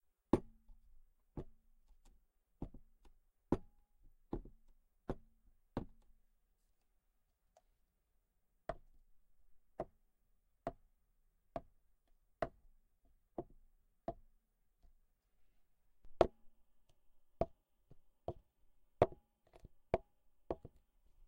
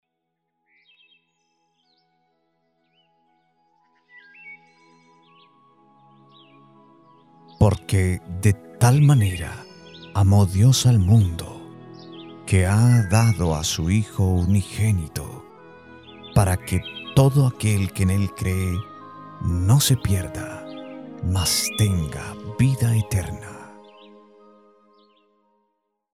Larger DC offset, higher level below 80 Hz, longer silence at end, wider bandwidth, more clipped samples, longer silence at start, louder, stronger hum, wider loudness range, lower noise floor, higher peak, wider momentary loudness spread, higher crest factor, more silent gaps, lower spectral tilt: neither; second, -60 dBFS vs -42 dBFS; second, 0.05 s vs 2.45 s; about the same, 16 kHz vs 16 kHz; neither; second, 0.35 s vs 4.45 s; second, -45 LUFS vs -21 LUFS; neither; first, 13 LU vs 8 LU; about the same, -81 dBFS vs -78 dBFS; second, -12 dBFS vs -2 dBFS; second, 17 LU vs 23 LU; first, 36 dB vs 20 dB; neither; first, -8 dB/octave vs -5.5 dB/octave